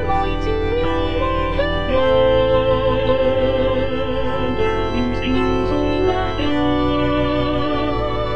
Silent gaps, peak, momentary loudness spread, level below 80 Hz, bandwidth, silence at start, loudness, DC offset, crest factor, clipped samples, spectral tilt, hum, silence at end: none; -6 dBFS; 5 LU; -28 dBFS; 7.6 kHz; 0 s; -19 LUFS; 4%; 12 dB; under 0.1%; -7.5 dB/octave; none; 0 s